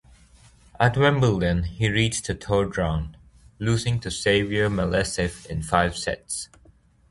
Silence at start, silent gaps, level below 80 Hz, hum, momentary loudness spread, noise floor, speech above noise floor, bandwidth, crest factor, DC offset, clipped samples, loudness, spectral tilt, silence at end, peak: 0.8 s; none; -40 dBFS; none; 11 LU; -56 dBFS; 33 dB; 11.5 kHz; 22 dB; under 0.1%; under 0.1%; -24 LUFS; -5 dB/octave; 0.65 s; -2 dBFS